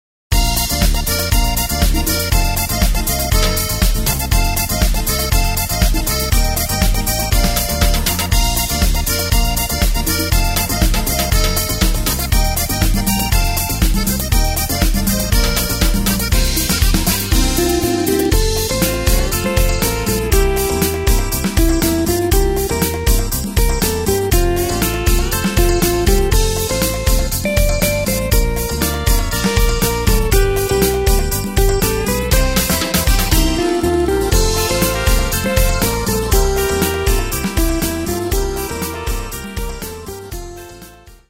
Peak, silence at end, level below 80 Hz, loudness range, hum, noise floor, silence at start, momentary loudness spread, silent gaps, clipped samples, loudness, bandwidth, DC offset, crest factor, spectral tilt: 0 dBFS; 0.15 s; -18 dBFS; 1 LU; none; -39 dBFS; 0.3 s; 3 LU; none; under 0.1%; -16 LUFS; 16.5 kHz; under 0.1%; 14 dB; -4 dB/octave